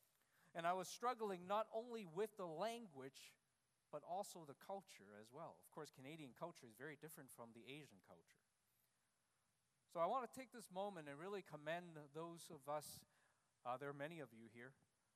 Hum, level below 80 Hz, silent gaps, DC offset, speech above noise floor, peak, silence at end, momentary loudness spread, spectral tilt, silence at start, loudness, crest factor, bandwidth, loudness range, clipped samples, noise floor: none; under -90 dBFS; none; under 0.1%; 36 dB; -30 dBFS; 0.45 s; 15 LU; -4.5 dB/octave; 0.45 s; -51 LUFS; 22 dB; 14.5 kHz; 11 LU; under 0.1%; -88 dBFS